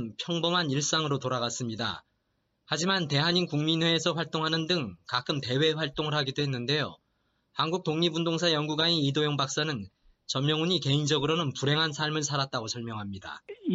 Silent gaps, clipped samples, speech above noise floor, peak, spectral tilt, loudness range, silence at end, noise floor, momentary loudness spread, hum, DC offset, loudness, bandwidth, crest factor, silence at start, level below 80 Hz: none; under 0.1%; 47 dB; -12 dBFS; -4 dB/octave; 2 LU; 0 s; -76 dBFS; 9 LU; none; under 0.1%; -28 LUFS; 8 kHz; 18 dB; 0 s; -66 dBFS